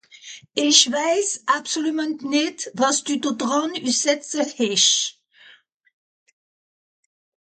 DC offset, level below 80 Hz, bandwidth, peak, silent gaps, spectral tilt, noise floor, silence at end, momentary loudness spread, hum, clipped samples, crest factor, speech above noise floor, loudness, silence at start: under 0.1%; -76 dBFS; 9.4 kHz; -2 dBFS; none; -1 dB/octave; -53 dBFS; 2.45 s; 11 LU; none; under 0.1%; 22 dB; 32 dB; -20 LUFS; 0.25 s